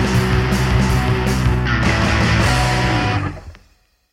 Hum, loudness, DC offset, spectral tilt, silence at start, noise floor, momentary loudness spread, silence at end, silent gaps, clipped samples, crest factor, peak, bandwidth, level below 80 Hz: none; -16 LUFS; under 0.1%; -5.5 dB/octave; 0 s; -56 dBFS; 5 LU; 0.55 s; none; under 0.1%; 14 dB; -4 dBFS; 15.5 kHz; -24 dBFS